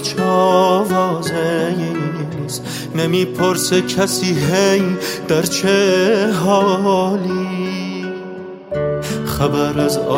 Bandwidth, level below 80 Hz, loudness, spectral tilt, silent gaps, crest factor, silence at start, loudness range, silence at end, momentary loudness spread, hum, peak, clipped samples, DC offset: 16 kHz; -46 dBFS; -17 LUFS; -5 dB/octave; none; 14 dB; 0 s; 4 LU; 0 s; 10 LU; none; -2 dBFS; under 0.1%; under 0.1%